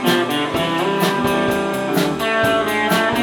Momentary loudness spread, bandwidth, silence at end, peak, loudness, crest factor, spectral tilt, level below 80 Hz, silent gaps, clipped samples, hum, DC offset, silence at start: 3 LU; 19.5 kHz; 0 s; -2 dBFS; -18 LUFS; 16 dB; -4.5 dB/octave; -48 dBFS; none; under 0.1%; none; under 0.1%; 0 s